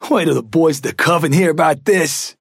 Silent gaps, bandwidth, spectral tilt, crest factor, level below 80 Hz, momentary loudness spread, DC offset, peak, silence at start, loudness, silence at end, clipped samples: none; 16.5 kHz; -5 dB/octave; 12 dB; -62 dBFS; 3 LU; under 0.1%; -4 dBFS; 0 s; -15 LUFS; 0.1 s; under 0.1%